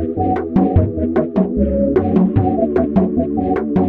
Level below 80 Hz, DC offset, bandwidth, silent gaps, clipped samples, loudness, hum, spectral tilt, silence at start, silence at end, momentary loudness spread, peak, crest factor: -32 dBFS; under 0.1%; 4.1 kHz; none; under 0.1%; -16 LUFS; none; -12 dB/octave; 0 s; 0 s; 4 LU; -2 dBFS; 14 dB